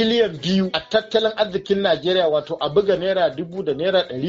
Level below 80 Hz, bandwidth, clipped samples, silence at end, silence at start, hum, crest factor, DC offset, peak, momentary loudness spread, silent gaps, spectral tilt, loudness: -54 dBFS; 7.6 kHz; under 0.1%; 0 s; 0 s; none; 16 dB; under 0.1%; -4 dBFS; 4 LU; none; -3.5 dB/octave; -20 LUFS